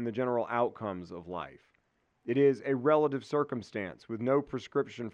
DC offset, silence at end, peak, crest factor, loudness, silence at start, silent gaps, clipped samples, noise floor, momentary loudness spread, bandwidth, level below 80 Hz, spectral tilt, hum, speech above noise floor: under 0.1%; 0.05 s; -14 dBFS; 18 dB; -31 LUFS; 0 s; none; under 0.1%; -75 dBFS; 14 LU; 8.6 kHz; -72 dBFS; -7.5 dB/octave; none; 44 dB